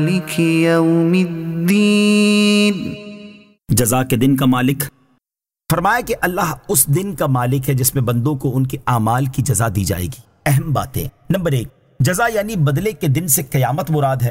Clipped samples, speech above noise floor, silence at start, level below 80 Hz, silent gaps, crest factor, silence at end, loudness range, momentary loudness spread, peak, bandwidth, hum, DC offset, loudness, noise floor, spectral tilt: under 0.1%; 73 dB; 0 s; -42 dBFS; none; 16 dB; 0 s; 4 LU; 9 LU; 0 dBFS; 16.5 kHz; none; under 0.1%; -16 LUFS; -89 dBFS; -5 dB/octave